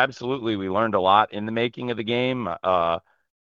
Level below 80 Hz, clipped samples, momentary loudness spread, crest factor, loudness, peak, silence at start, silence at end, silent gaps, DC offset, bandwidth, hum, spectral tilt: -62 dBFS; under 0.1%; 8 LU; 20 dB; -23 LUFS; -4 dBFS; 0 s; 0.45 s; none; under 0.1%; 7.4 kHz; none; -6.5 dB/octave